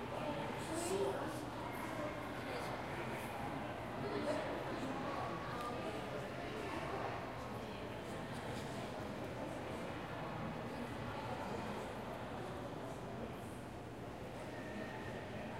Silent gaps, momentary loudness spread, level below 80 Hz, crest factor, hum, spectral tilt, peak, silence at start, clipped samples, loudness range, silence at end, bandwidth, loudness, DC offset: none; 6 LU; -62 dBFS; 16 dB; none; -5.5 dB/octave; -28 dBFS; 0 s; under 0.1%; 4 LU; 0 s; 16 kHz; -44 LUFS; under 0.1%